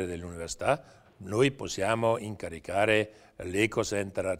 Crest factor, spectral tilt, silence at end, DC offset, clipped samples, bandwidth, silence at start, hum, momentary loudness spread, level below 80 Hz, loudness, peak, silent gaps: 20 dB; -4.5 dB/octave; 0 s; under 0.1%; under 0.1%; 16 kHz; 0 s; none; 12 LU; -56 dBFS; -29 LUFS; -10 dBFS; none